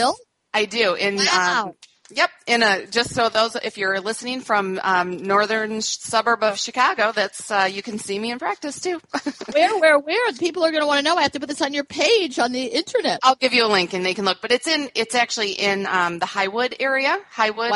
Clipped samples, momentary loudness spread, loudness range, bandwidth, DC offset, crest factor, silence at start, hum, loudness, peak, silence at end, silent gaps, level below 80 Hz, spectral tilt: under 0.1%; 9 LU; 2 LU; 11.5 kHz; under 0.1%; 18 dB; 0 s; none; -20 LUFS; -2 dBFS; 0 s; none; -64 dBFS; -2.5 dB/octave